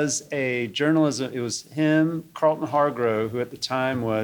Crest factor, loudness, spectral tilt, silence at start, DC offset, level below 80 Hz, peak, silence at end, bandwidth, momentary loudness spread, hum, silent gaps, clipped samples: 16 dB; -24 LUFS; -5 dB/octave; 0 s; under 0.1%; -64 dBFS; -8 dBFS; 0 s; 20 kHz; 7 LU; none; none; under 0.1%